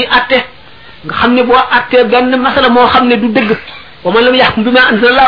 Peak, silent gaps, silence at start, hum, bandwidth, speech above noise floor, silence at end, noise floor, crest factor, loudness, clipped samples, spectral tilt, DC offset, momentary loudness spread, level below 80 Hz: 0 dBFS; none; 0 s; none; 5.4 kHz; 28 dB; 0 s; -36 dBFS; 8 dB; -8 LUFS; 0.3%; -6.5 dB/octave; 1%; 11 LU; -38 dBFS